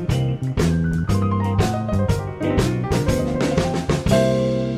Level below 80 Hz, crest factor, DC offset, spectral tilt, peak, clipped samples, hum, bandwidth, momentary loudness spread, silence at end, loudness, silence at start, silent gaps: -34 dBFS; 16 dB; under 0.1%; -6.5 dB/octave; -4 dBFS; under 0.1%; none; 15.5 kHz; 4 LU; 0 s; -20 LUFS; 0 s; none